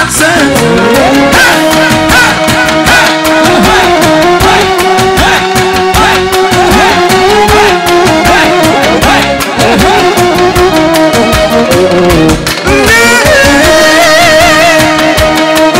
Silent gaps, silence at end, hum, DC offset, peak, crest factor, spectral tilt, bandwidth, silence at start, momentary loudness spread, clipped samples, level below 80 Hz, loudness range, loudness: none; 0 s; none; under 0.1%; 0 dBFS; 6 dB; -3.5 dB/octave; 16.5 kHz; 0 s; 4 LU; 0.2%; -22 dBFS; 2 LU; -5 LUFS